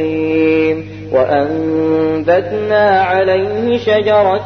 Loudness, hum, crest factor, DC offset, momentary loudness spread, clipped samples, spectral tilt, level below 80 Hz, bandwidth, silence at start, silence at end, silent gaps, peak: -13 LUFS; 50 Hz at -30 dBFS; 12 dB; 0.2%; 4 LU; under 0.1%; -7.5 dB/octave; -48 dBFS; 6.4 kHz; 0 s; 0 s; none; 0 dBFS